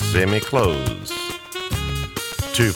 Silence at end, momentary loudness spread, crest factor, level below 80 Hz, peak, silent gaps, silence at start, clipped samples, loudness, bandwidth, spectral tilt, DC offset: 0 s; 8 LU; 18 dB; -36 dBFS; -4 dBFS; none; 0 s; under 0.1%; -22 LUFS; 19 kHz; -4.5 dB/octave; under 0.1%